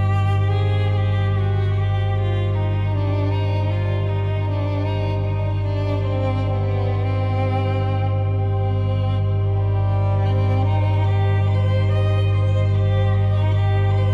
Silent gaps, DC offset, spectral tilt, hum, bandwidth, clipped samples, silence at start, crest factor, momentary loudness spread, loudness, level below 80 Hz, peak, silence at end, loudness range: none; under 0.1%; -9 dB/octave; 50 Hz at -45 dBFS; 4.9 kHz; under 0.1%; 0 s; 10 dB; 3 LU; -20 LUFS; -36 dBFS; -10 dBFS; 0 s; 3 LU